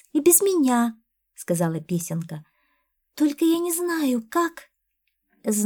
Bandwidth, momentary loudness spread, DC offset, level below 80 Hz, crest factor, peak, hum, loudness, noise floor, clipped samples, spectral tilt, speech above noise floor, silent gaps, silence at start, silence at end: 20 kHz; 15 LU; under 0.1%; -72 dBFS; 20 dB; -4 dBFS; none; -22 LUFS; -75 dBFS; under 0.1%; -4.5 dB/octave; 53 dB; none; 0.15 s; 0 s